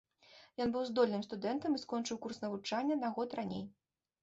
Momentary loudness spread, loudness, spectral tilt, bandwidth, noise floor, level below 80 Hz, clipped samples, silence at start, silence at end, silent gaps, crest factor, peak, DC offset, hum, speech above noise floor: 9 LU; -37 LUFS; -5 dB/octave; 8 kHz; -63 dBFS; -74 dBFS; under 0.1%; 0.3 s; 0.5 s; none; 18 dB; -20 dBFS; under 0.1%; none; 26 dB